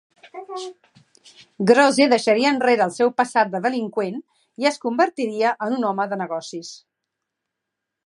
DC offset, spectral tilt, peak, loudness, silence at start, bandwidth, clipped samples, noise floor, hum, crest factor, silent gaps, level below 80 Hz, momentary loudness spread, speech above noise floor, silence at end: under 0.1%; -4.5 dB/octave; -2 dBFS; -20 LUFS; 0.35 s; 11.5 kHz; under 0.1%; -82 dBFS; none; 20 dB; none; -76 dBFS; 19 LU; 62 dB; 1.3 s